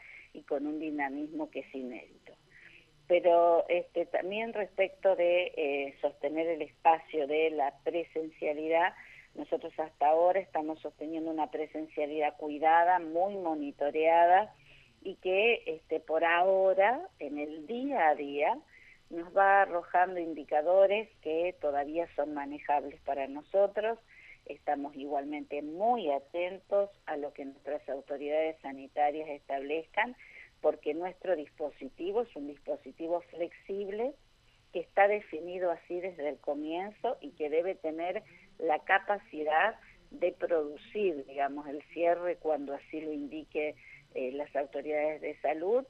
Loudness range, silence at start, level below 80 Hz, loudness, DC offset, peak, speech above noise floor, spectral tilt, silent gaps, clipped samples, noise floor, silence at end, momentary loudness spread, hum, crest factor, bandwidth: 7 LU; 0.05 s; -68 dBFS; -32 LUFS; under 0.1%; -10 dBFS; 33 dB; -6 dB/octave; none; under 0.1%; -64 dBFS; 0.05 s; 14 LU; none; 20 dB; 6.4 kHz